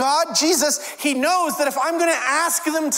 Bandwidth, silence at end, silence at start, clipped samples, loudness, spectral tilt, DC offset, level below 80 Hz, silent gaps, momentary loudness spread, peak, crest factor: 16.5 kHz; 0 s; 0 s; under 0.1%; -19 LUFS; -0.5 dB/octave; under 0.1%; -70 dBFS; none; 4 LU; -6 dBFS; 14 dB